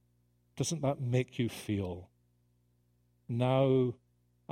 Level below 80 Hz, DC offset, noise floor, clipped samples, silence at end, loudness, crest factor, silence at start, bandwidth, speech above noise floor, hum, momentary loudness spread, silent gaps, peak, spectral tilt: -66 dBFS; under 0.1%; -72 dBFS; under 0.1%; 0.6 s; -33 LUFS; 18 dB; 0.55 s; 15.5 kHz; 41 dB; 60 Hz at -55 dBFS; 13 LU; none; -16 dBFS; -6.5 dB/octave